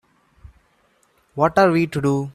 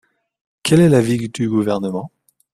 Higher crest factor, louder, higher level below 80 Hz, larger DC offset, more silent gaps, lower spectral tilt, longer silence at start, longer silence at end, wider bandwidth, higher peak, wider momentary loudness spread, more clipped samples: about the same, 20 dB vs 16 dB; about the same, -18 LUFS vs -17 LUFS; about the same, -52 dBFS vs -52 dBFS; neither; neither; about the same, -7 dB/octave vs -6.5 dB/octave; first, 1.35 s vs 0.65 s; second, 0.05 s vs 0.45 s; about the same, 14 kHz vs 14 kHz; about the same, -2 dBFS vs -2 dBFS; second, 7 LU vs 14 LU; neither